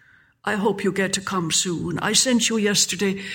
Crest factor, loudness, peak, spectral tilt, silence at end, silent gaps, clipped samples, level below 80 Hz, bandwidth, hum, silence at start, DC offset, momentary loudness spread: 18 dB; -21 LUFS; -4 dBFS; -2.5 dB/octave; 0 s; none; under 0.1%; -58 dBFS; 17.5 kHz; none; 0.45 s; under 0.1%; 7 LU